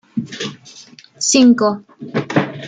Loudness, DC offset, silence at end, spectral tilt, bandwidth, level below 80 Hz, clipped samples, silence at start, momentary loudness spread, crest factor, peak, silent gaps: -16 LUFS; under 0.1%; 0 s; -4 dB/octave; 9.4 kHz; -60 dBFS; under 0.1%; 0.15 s; 16 LU; 16 dB; -2 dBFS; none